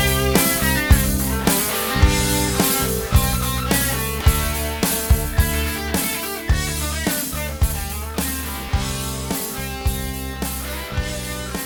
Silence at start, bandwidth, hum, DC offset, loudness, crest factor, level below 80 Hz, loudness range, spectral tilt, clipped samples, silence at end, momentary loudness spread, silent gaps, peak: 0 s; over 20 kHz; none; under 0.1%; -20 LUFS; 20 dB; -24 dBFS; 7 LU; -4 dB/octave; under 0.1%; 0 s; 9 LU; none; 0 dBFS